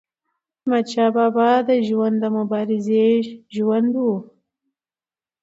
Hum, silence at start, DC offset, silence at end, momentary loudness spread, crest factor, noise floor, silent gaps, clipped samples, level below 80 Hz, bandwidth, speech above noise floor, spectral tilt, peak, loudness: none; 0.65 s; under 0.1%; 1.15 s; 7 LU; 16 dB; under -90 dBFS; none; under 0.1%; -72 dBFS; 7.8 kHz; over 72 dB; -7 dB/octave; -4 dBFS; -19 LUFS